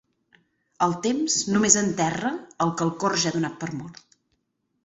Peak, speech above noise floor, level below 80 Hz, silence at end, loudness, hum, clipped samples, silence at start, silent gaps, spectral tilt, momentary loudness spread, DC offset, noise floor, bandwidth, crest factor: -4 dBFS; 50 dB; -62 dBFS; 0.9 s; -23 LUFS; none; under 0.1%; 0.8 s; none; -3.5 dB/octave; 14 LU; under 0.1%; -74 dBFS; 8.2 kHz; 22 dB